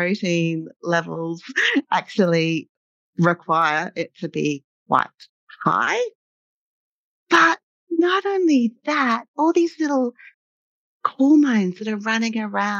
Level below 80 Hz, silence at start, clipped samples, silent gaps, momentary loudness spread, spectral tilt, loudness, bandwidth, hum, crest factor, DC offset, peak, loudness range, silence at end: -74 dBFS; 0 s; under 0.1%; 2.69-3.13 s, 4.64-4.86 s, 5.29-5.47 s, 6.15-7.26 s, 7.63-7.87 s, 9.28-9.34 s, 10.34-11.00 s; 12 LU; -5.5 dB/octave; -21 LUFS; 7.6 kHz; none; 18 dB; under 0.1%; -4 dBFS; 3 LU; 0 s